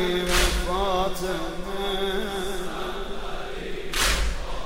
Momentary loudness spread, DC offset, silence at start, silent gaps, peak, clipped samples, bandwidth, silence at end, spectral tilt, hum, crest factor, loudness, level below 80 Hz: 12 LU; 0.6%; 0 s; none; -6 dBFS; under 0.1%; 16 kHz; 0 s; -3 dB/octave; none; 20 dB; -27 LUFS; -32 dBFS